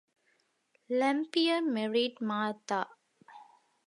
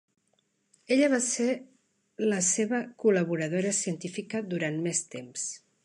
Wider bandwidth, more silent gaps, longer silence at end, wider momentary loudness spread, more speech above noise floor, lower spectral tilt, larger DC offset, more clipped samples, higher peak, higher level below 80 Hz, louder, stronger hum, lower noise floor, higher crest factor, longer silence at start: about the same, 11.5 kHz vs 11.5 kHz; neither; first, 0.45 s vs 0.25 s; second, 6 LU vs 10 LU; about the same, 43 dB vs 45 dB; about the same, -4.5 dB/octave vs -4 dB/octave; neither; neither; second, -16 dBFS vs -12 dBFS; second, -90 dBFS vs -80 dBFS; second, -31 LUFS vs -28 LUFS; neither; about the same, -74 dBFS vs -73 dBFS; about the same, 18 dB vs 18 dB; about the same, 0.9 s vs 0.9 s